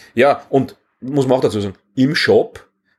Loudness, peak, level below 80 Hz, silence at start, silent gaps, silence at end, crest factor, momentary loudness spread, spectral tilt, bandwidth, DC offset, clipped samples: -17 LUFS; -2 dBFS; -58 dBFS; 0.15 s; none; 0.4 s; 16 dB; 12 LU; -6 dB/octave; 13 kHz; under 0.1%; under 0.1%